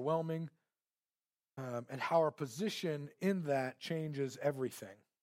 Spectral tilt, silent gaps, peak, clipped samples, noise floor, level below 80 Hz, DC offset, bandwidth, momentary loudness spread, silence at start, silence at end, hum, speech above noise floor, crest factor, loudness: -6 dB/octave; none; -20 dBFS; under 0.1%; under -90 dBFS; -86 dBFS; under 0.1%; 16 kHz; 14 LU; 0 s; 0.25 s; none; over 53 dB; 20 dB; -38 LUFS